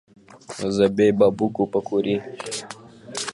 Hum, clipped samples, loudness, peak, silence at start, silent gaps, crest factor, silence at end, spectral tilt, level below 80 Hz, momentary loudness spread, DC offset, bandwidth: none; under 0.1%; -22 LUFS; -4 dBFS; 0.3 s; none; 18 dB; 0 s; -5 dB/octave; -58 dBFS; 18 LU; under 0.1%; 11.5 kHz